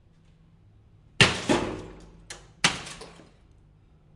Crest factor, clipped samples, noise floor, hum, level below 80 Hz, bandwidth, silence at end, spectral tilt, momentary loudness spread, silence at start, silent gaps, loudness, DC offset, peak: 28 dB; under 0.1%; -57 dBFS; none; -52 dBFS; 11.5 kHz; 1.05 s; -3 dB/octave; 24 LU; 1.2 s; none; -24 LUFS; under 0.1%; -2 dBFS